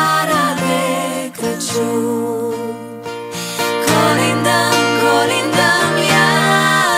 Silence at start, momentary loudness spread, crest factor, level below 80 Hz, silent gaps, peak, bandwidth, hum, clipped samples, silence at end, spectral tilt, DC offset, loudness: 0 s; 11 LU; 14 dB; -58 dBFS; none; 0 dBFS; 16 kHz; none; under 0.1%; 0 s; -3.5 dB/octave; under 0.1%; -15 LUFS